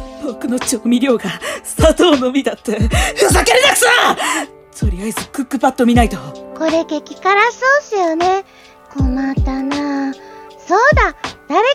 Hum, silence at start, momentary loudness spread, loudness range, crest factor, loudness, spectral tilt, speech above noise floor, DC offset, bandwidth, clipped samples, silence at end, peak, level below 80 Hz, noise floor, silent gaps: none; 0 s; 13 LU; 5 LU; 14 dB; -14 LUFS; -4 dB/octave; 22 dB; under 0.1%; 16.5 kHz; under 0.1%; 0 s; 0 dBFS; -26 dBFS; -36 dBFS; none